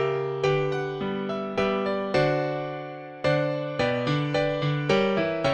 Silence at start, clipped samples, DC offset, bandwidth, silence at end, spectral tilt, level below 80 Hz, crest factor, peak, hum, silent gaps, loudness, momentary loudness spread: 0 s; under 0.1%; under 0.1%; 9 kHz; 0 s; -6.5 dB/octave; -56 dBFS; 16 dB; -10 dBFS; none; none; -26 LUFS; 6 LU